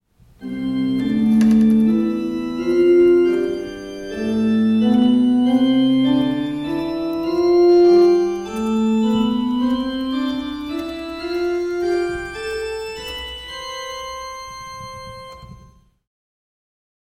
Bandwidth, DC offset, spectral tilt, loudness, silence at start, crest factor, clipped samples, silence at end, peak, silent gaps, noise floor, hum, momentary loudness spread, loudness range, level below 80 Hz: 12 kHz; under 0.1%; -6.5 dB/octave; -18 LUFS; 0.4 s; 12 dB; under 0.1%; 1.55 s; -6 dBFS; none; -48 dBFS; none; 17 LU; 13 LU; -46 dBFS